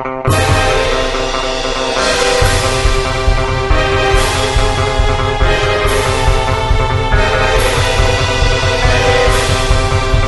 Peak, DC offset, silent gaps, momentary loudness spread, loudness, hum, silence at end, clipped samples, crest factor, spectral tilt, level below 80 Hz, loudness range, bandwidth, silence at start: 0 dBFS; 0.3%; none; 4 LU; -13 LUFS; none; 0 s; under 0.1%; 12 dB; -4 dB/octave; -18 dBFS; 1 LU; 12 kHz; 0 s